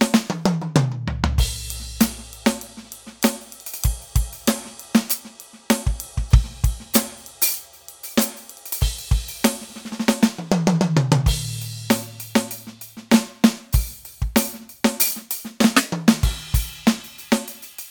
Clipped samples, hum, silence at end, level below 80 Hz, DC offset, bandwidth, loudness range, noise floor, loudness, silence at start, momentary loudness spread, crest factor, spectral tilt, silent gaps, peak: under 0.1%; none; 0 s; -28 dBFS; under 0.1%; over 20 kHz; 4 LU; -43 dBFS; -22 LUFS; 0 s; 14 LU; 22 dB; -4.5 dB/octave; none; 0 dBFS